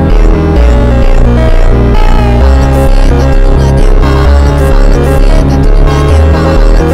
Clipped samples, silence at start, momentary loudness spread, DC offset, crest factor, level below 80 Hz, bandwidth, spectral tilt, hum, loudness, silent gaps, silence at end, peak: 3%; 0 s; 2 LU; under 0.1%; 4 dB; -6 dBFS; 10.5 kHz; -7.5 dB/octave; none; -7 LUFS; none; 0 s; 0 dBFS